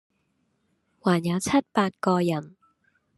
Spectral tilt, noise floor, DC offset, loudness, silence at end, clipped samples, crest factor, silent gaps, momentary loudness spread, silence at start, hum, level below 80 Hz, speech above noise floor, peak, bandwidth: -6 dB/octave; -72 dBFS; under 0.1%; -25 LUFS; 0.7 s; under 0.1%; 20 dB; none; 5 LU; 1.05 s; none; -66 dBFS; 48 dB; -8 dBFS; 12.5 kHz